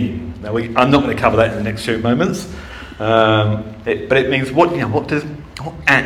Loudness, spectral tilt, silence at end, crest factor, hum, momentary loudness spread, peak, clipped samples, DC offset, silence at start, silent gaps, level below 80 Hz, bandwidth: -16 LUFS; -6 dB/octave; 0 s; 16 dB; none; 14 LU; 0 dBFS; under 0.1%; under 0.1%; 0 s; none; -38 dBFS; 14 kHz